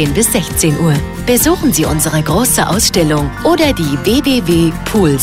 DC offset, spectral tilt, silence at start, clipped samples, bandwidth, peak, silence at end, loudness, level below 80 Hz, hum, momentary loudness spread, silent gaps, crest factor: under 0.1%; -4.5 dB/octave; 0 s; under 0.1%; 16.5 kHz; 0 dBFS; 0 s; -12 LUFS; -28 dBFS; none; 3 LU; none; 12 dB